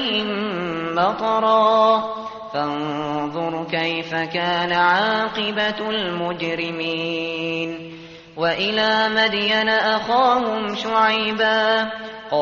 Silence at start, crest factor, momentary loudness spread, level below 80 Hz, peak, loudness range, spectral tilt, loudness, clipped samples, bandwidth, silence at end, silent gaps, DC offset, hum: 0 s; 16 dB; 9 LU; -58 dBFS; -4 dBFS; 5 LU; -1.5 dB/octave; -20 LUFS; under 0.1%; 7.2 kHz; 0 s; none; under 0.1%; none